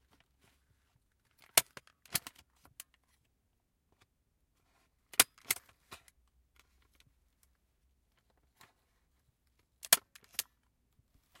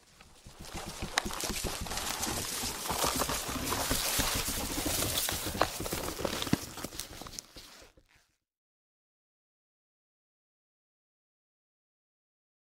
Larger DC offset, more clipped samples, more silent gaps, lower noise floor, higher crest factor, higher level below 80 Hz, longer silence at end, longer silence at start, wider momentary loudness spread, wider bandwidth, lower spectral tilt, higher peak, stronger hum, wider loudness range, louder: neither; neither; neither; first, -79 dBFS vs -69 dBFS; first, 36 dB vs 28 dB; second, -74 dBFS vs -48 dBFS; second, 1.45 s vs 4.9 s; first, 1.55 s vs 0.2 s; first, 25 LU vs 14 LU; about the same, 16.5 kHz vs 16 kHz; second, 1 dB/octave vs -2.5 dB/octave; first, -4 dBFS vs -8 dBFS; neither; second, 9 LU vs 14 LU; about the same, -32 LUFS vs -33 LUFS